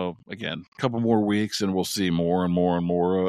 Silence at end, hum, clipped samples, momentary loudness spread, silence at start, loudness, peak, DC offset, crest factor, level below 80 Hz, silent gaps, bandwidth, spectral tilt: 0 s; none; under 0.1%; 10 LU; 0 s; -25 LUFS; -8 dBFS; under 0.1%; 16 dB; -56 dBFS; 0.68-0.72 s; 15 kHz; -6 dB/octave